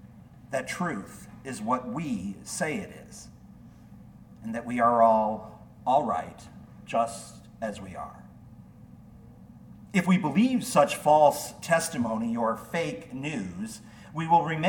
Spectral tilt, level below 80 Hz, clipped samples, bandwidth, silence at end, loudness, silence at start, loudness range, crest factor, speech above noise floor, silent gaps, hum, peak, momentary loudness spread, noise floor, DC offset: -5.5 dB/octave; -60 dBFS; under 0.1%; 18 kHz; 0 s; -27 LUFS; 0.05 s; 10 LU; 20 dB; 23 dB; none; none; -8 dBFS; 21 LU; -50 dBFS; under 0.1%